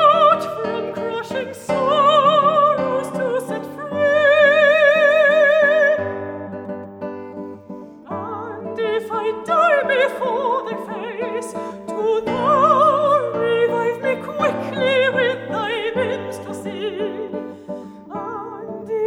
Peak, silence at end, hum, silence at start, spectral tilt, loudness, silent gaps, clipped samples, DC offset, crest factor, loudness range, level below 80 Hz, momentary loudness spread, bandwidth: -2 dBFS; 0 s; none; 0 s; -5 dB/octave; -18 LUFS; none; under 0.1%; under 0.1%; 16 dB; 10 LU; -64 dBFS; 18 LU; 12.5 kHz